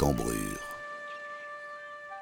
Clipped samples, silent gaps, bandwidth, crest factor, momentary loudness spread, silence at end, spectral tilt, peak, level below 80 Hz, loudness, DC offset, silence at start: under 0.1%; none; 19.5 kHz; 22 dB; 11 LU; 0 s; -5 dB/octave; -12 dBFS; -46 dBFS; -36 LUFS; under 0.1%; 0 s